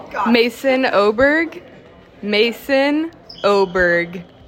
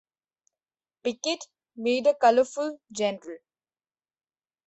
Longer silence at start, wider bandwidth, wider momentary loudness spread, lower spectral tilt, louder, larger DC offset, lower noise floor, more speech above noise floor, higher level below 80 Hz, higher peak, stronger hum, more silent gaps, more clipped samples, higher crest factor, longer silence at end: second, 0 s vs 1.05 s; first, 16.5 kHz vs 8.4 kHz; second, 9 LU vs 20 LU; first, -5 dB/octave vs -3 dB/octave; first, -16 LUFS vs -26 LUFS; neither; second, -43 dBFS vs under -90 dBFS; second, 27 dB vs over 65 dB; first, -48 dBFS vs -76 dBFS; first, -2 dBFS vs -8 dBFS; neither; neither; neither; second, 14 dB vs 20 dB; second, 0.25 s vs 1.3 s